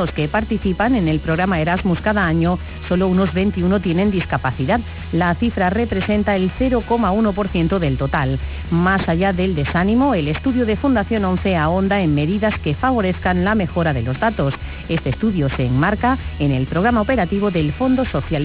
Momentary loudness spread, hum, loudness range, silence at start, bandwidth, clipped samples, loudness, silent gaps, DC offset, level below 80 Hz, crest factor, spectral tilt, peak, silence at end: 4 LU; none; 1 LU; 0 s; 4 kHz; under 0.1%; -18 LUFS; none; 0.4%; -30 dBFS; 12 dB; -11 dB/octave; -6 dBFS; 0 s